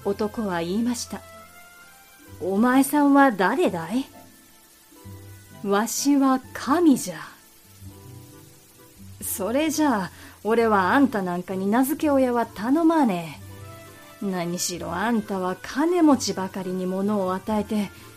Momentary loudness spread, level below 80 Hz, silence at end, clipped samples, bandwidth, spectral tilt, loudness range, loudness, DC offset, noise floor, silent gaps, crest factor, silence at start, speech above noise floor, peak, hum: 19 LU; -60 dBFS; 0.05 s; under 0.1%; 15.5 kHz; -5 dB/octave; 4 LU; -23 LUFS; under 0.1%; -53 dBFS; none; 18 dB; 0 s; 30 dB; -6 dBFS; none